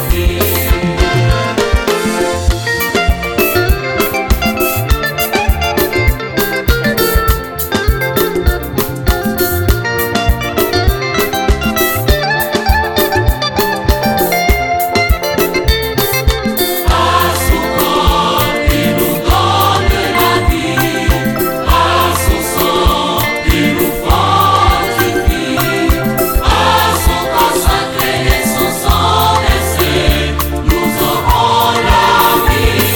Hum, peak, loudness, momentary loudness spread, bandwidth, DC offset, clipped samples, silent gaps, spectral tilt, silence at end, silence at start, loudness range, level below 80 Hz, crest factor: none; 0 dBFS; -12 LUFS; 4 LU; 19.5 kHz; under 0.1%; under 0.1%; none; -4.5 dB/octave; 0 s; 0 s; 2 LU; -18 dBFS; 12 dB